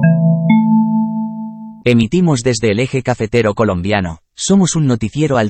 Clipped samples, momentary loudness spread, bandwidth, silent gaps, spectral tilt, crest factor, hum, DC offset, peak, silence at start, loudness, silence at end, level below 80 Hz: under 0.1%; 10 LU; 8.8 kHz; none; -6 dB/octave; 14 dB; none; under 0.1%; 0 dBFS; 0 s; -14 LUFS; 0 s; -42 dBFS